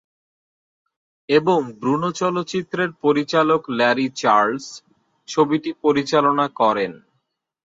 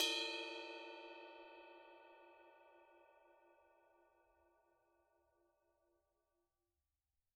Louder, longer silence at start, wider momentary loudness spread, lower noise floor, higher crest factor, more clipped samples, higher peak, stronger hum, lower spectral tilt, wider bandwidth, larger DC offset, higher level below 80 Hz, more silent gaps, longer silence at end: first, -19 LUFS vs -46 LUFS; first, 1.3 s vs 0 s; second, 7 LU vs 25 LU; second, -72 dBFS vs under -90 dBFS; second, 18 dB vs 28 dB; neither; first, -2 dBFS vs -26 dBFS; neither; first, -5 dB/octave vs 1 dB/octave; second, 7.8 kHz vs 11.5 kHz; neither; first, -66 dBFS vs under -90 dBFS; neither; second, 0.8 s vs 3.75 s